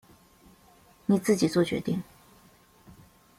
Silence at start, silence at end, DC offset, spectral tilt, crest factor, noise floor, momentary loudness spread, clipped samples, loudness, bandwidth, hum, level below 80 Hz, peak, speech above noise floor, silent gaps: 1.1 s; 1.35 s; under 0.1%; -6 dB/octave; 20 dB; -58 dBFS; 12 LU; under 0.1%; -27 LUFS; 16 kHz; none; -64 dBFS; -10 dBFS; 33 dB; none